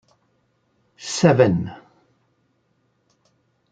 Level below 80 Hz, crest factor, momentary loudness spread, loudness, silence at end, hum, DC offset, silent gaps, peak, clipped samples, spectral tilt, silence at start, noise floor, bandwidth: -60 dBFS; 22 dB; 19 LU; -19 LUFS; 1.95 s; none; under 0.1%; none; -2 dBFS; under 0.1%; -6 dB/octave; 1 s; -67 dBFS; 9.4 kHz